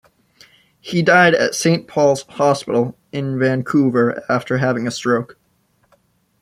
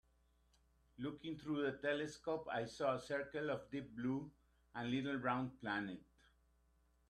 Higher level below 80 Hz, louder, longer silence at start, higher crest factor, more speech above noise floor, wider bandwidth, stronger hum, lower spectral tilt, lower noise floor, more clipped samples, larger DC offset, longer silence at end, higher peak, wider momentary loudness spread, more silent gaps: first, -60 dBFS vs -72 dBFS; first, -17 LUFS vs -43 LUFS; second, 0.85 s vs 1 s; about the same, 18 dB vs 20 dB; first, 45 dB vs 33 dB; first, 14 kHz vs 11.5 kHz; neither; about the same, -5.5 dB/octave vs -6 dB/octave; second, -62 dBFS vs -76 dBFS; neither; neither; about the same, 1.1 s vs 1.1 s; first, 0 dBFS vs -24 dBFS; about the same, 11 LU vs 9 LU; neither